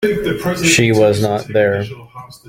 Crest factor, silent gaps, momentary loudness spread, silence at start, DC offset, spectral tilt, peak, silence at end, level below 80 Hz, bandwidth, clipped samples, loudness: 14 dB; none; 11 LU; 0 s; under 0.1%; -4.5 dB/octave; 0 dBFS; 0.1 s; -44 dBFS; 17 kHz; under 0.1%; -14 LUFS